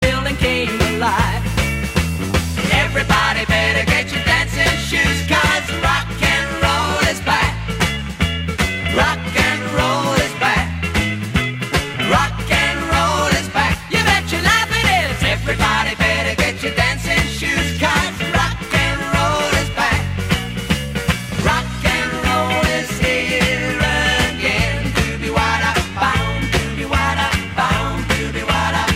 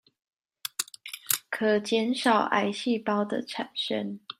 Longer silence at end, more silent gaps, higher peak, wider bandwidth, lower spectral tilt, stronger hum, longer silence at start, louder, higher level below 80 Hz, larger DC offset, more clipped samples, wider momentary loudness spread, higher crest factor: about the same, 0 s vs 0.05 s; neither; about the same, -2 dBFS vs -4 dBFS; about the same, 16 kHz vs 16 kHz; about the same, -4 dB/octave vs -3 dB/octave; neither; second, 0 s vs 0.65 s; first, -17 LUFS vs -28 LUFS; first, -28 dBFS vs -78 dBFS; neither; neither; second, 5 LU vs 10 LU; second, 16 dB vs 24 dB